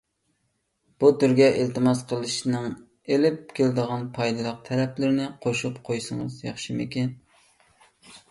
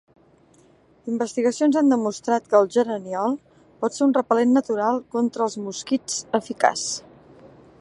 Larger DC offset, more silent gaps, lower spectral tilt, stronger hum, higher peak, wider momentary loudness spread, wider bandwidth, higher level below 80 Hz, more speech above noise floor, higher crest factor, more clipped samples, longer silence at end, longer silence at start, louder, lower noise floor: neither; neither; first, -6 dB/octave vs -4 dB/octave; neither; second, -6 dBFS vs -2 dBFS; about the same, 12 LU vs 10 LU; about the same, 11.5 kHz vs 11.5 kHz; about the same, -64 dBFS vs -68 dBFS; first, 50 dB vs 34 dB; about the same, 20 dB vs 20 dB; neither; second, 0.15 s vs 0.35 s; about the same, 1 s vs 1.05 s; second, -25 LUFS vs -22 LUFS; first, -74 dBFS vs -56 dBFS